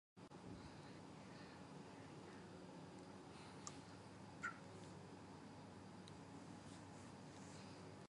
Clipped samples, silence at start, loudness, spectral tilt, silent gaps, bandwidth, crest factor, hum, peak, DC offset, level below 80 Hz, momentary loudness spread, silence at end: under 0.1%; 0.15 s; -57 LUFS; -5 dB/octave; none; 11.5 kHz; 26 dB; none; -32 dBFS; under 0.1%; -76 dBFS; 4 LU; 0 s